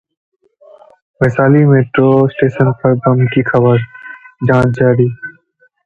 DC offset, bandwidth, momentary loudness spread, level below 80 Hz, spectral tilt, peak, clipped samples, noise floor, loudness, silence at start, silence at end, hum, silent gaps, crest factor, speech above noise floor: under 0.1%; 6.8 kHz; 15 LU; -44 dBFS; -9.5 dB/octave; 0 dBFS; under 0.1%; -54 dBFS; -12 LUFS; 1.2 s; 0.55 s; none; none; 12 dB; 43 dB